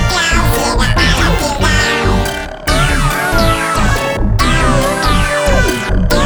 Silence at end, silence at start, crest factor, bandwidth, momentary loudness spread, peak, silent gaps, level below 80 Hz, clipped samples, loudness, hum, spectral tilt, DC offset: 0 s; 0 s; 12 dB; over 20 kHz; 4 LU; 0 dBFS; none; -16 dBFS; under 0.1%; -13 LUFS; none; -4 dB/octave; under 0.1%